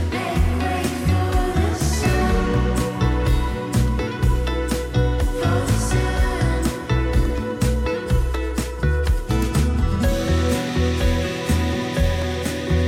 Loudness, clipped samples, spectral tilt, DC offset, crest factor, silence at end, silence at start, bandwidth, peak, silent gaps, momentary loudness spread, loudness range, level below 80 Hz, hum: -21 LUFS; under 0.1%; -6 dB/octave; under 0.1%; 12 dB; 0 s; 0 s; 16.5 kHz; -8 dBFS; none; 3 LU; 1 LU; -24 dBFS; none